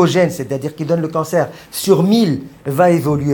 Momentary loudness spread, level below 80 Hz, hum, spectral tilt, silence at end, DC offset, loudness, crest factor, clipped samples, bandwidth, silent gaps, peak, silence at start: 10 LU; -50 dBFS; none; -6 dB/octave; 0 s; under 0.1%; -16 LUFS; 14 dB; under 0.1%; 19 kHz; none; 0 dBFS; 0 s